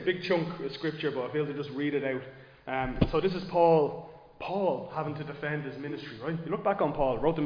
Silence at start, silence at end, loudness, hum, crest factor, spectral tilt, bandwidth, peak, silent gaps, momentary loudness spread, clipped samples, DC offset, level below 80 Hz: 0 s; 0 s; -30 LUFS; none; 22 dB; -8.5 dB/octave; 5.2 kHz; -8 dBFS; none; 12 LU; under 0.1%; under 0.1%; -48 dBFS